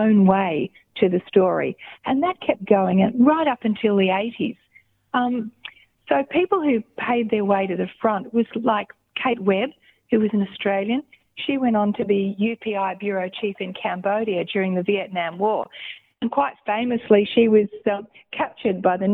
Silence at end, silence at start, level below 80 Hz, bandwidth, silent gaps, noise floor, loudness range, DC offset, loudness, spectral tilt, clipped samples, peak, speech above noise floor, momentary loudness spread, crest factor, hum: 0 s; 0 s; -62 dBFS; 4 kHz; none; -57 dBFS; 4 LU; under 0.1%; -22 LUFS; -9.5 dB/octave; under 0.1%; -2 dBFS; 37 dB; 11 LU; 20 dB; none